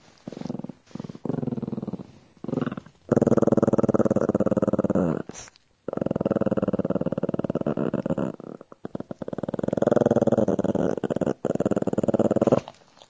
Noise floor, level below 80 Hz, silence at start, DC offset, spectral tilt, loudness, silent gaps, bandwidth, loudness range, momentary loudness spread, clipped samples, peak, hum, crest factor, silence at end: -47 dBFS; -52 dBFS; 0.25 s; under 0.1%; -8.5 dB/octave; -25 LUFS; none; 8 kHz; 5 LU; 18 LU; under 0.1%; -6 dBFS; none; 20 dB; 0.4 s